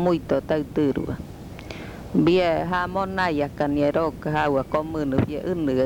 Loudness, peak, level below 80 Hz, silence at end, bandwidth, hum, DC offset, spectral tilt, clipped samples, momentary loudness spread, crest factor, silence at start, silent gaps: -23 LUFS; -8 dBFS; -44 dBFS; 0 s; 19 kHz; none; under 0.1%; -7.5 dB/octave; under 0.1%; 15 LU; 16 dB; 0 s; none